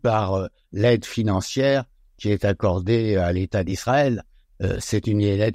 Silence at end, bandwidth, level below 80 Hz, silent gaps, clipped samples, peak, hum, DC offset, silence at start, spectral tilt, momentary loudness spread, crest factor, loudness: 0 s; 14.5 kHz; -44 dBFS; none; under 0.1%; -6 dBFS; none; under 0.1%; 0.05 s; -6.5 dB/octave; 7 LU; 14 dB; -22 LUFS